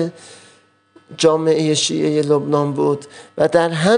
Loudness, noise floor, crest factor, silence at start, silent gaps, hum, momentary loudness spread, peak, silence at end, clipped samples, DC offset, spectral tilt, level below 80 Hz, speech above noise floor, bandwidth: -17 LUFS; -52 dBFS; 16 dB; 0 s; none; none; 6 LU; -2 dBFS; 0 s; under 0.1%; under 0.1%; -4.5 dB/octave; -62 dBFS; 35 dB; 10.5 kHz